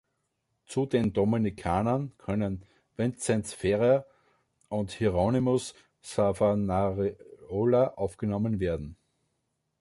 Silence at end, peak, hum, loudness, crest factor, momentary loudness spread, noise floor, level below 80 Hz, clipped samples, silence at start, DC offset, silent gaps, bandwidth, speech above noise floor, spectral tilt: 0.85 s; -12 dBFS; none; -28 LUFS; 16 dB; 10 LU; -79 dBFS; -50 dBFS; under 0.1%; 0.7 s; under 0.1%; none; 11.5 kHz; 51 dB; -7 dB/octave